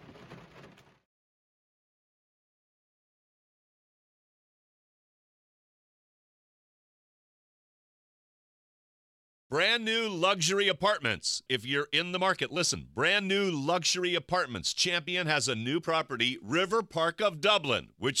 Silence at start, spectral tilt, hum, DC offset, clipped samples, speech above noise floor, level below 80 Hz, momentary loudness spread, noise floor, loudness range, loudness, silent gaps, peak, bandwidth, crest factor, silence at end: 0.05 s; -2.5 dB/octave; none; under 0.1%; under 0.1%; 26 dB; -68 dBFS; 5 LU; -55 dBFS; 4 LU; -28 LUFS; 1.05-9.50 s; -10 dBFS; 15.5 kHz; 22 dB; 0 s